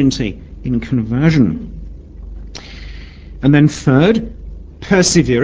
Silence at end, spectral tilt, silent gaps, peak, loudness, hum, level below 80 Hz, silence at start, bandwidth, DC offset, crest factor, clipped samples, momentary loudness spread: 0 s; -5.5 dB/octave; none; 0 dBFS; -14 LUFS; none; -32 dBFS; 0 s; 8 kHz; under 0.1%; 16 dB; under 0.1%; 23 LU